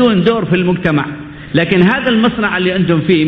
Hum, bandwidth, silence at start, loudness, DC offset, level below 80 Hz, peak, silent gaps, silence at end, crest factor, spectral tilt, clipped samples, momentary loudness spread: none; 5.4 kHz; 0 s; -13 LUFS; under 0.1%; -42 dBFS; 0 dBFS; none; 0 s; 12 dB; -9 dB/octave; under 0.1%; 7 LU